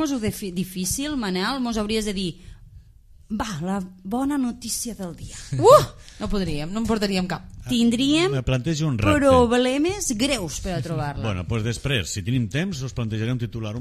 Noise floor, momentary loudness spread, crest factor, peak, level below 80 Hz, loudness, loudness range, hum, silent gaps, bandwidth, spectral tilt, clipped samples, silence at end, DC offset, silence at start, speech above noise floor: -49 dBFS; 13 LU; 22 dB; -2 dBFS; -40 dBFS; -23 LUFS; 7 LU; none; none; 15 kHz; -5 dB/octave; under 0.1%; 0 s; under 0.1%; 0 s; 27 dB